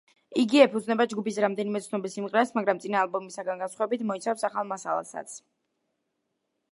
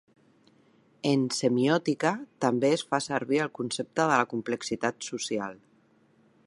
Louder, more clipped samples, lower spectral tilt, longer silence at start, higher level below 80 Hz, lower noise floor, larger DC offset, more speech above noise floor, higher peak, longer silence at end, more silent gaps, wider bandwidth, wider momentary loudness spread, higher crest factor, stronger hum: about the same, -27 LUFS vs -28 LUFS; neither; about the same, -4.5 dB/octave vs -4.5 dB/octave; second, 0.3 s vs 1.05 s; second, -82 dBFS vs -74 dBFS; first, -79 dBFS vs -64 dBFS; neither; first, 53 dB vs 36 dB; first, -4 dBFS vs -8 dBFS; first, 1.35 s vs 0.9 s; neither; about the same, 11.5 kHz vs 11.5 kHz; first, 12 LU vs 8 LU; about the same, 24 dB vs 22 dB; neither